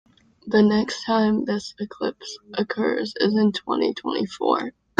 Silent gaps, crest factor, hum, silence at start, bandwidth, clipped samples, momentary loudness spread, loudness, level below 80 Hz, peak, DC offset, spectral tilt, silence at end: none; 22 dB; none; 0.45 s; 9 kHz; under 0.1%; 10 LU; -23 LUFS; -60 dBFS; -2 dBFS; under 0.1%; -5.5 dB/octave; 0.3 s